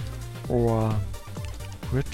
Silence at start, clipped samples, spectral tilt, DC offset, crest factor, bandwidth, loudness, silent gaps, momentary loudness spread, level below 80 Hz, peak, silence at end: 0 s; under 0.1%; -7.5 dB/octave; under 0.1%; 16 dB; 16 kHz; -29 LUFS; none; 13 LU; -38 dBFS; -12 dBFS; 0 s